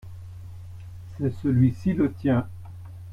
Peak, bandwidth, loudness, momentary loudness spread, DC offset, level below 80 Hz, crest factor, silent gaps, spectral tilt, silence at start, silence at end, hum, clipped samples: -8 dBFS; 7 kHz; -24 LUFS; 20 LU; under 0.1%; -50 dBFS; 18 dB; none; -10 dB/octave; 0.05 s; 0 s; none; under 0.1%